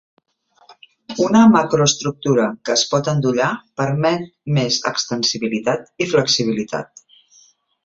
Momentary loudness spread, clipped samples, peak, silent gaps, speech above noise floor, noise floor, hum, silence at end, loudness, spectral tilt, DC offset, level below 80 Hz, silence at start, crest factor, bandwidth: 11 LU; under 0.1%; 0 dBFS; none; 36 dB; -54 dBFS; none; 1 s; -18 LUFS; -4.5 dB/octave; under 0.1%; -58 dBFS; 0.7 s; 18 dB; 7.8 kHz